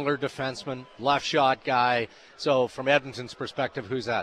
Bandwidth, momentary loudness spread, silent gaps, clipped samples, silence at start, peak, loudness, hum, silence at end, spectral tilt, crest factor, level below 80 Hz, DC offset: 11 kHz; 12 LU; none; under 0.1%; 0 s; -8 dBFS; -26 LUFS; none; 0 s; -4.5 dB/octave; 20 dB; -66 dBFS; under 0.1%